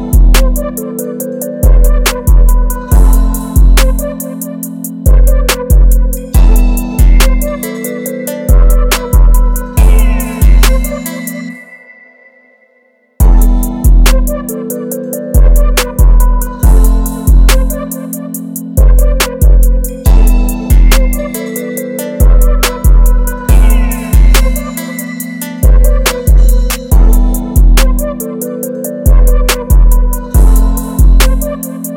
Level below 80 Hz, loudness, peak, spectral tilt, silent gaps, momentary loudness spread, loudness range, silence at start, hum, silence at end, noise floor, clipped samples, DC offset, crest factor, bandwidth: -8 dBFS; -11 LUFS; 0 dBFS; -5 dB/octave; none; 10 LU; 3 LU; 0 s; none; 0 s; -51 dBFS; 2%; under 0.1%; 8 dB; 17 kHz